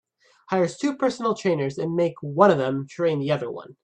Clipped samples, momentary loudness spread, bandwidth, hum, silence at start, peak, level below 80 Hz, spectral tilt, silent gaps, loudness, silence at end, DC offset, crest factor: under 0.1%; 9 LU; 9.6 kHz; none; 0.5 s; -2 dBFS; -68 dBFS; -6.5 dB/octave; none; -23 LUFS; 0.15 s; under 0.1%; 20 dB